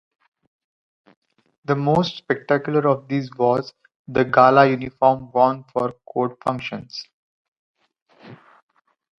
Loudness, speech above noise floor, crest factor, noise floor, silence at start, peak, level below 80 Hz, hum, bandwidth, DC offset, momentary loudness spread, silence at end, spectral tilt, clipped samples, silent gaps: -20 LUFS; 26 dB; 22 dB; -45 dBFS; 1.7 s; 0 dBFS; -60 dBFS; none; 7.2 kHz; under 0.1%; 15 LU; 0.85 s; -7.5 dB/octave; under 0.1%; 3.96-4.05 s, 7.13-7.74 s, 8.02-8.06 s